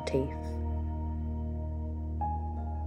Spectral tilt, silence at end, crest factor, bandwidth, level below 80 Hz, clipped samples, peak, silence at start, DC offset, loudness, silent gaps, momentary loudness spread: -8 dB/octave; 0 s; 16 dB; 8.8 kHz; -36 dBFS; under 0.1%; -16 dBFS; 0 s; under 0.1%; -35 LUFS; none; 4 LU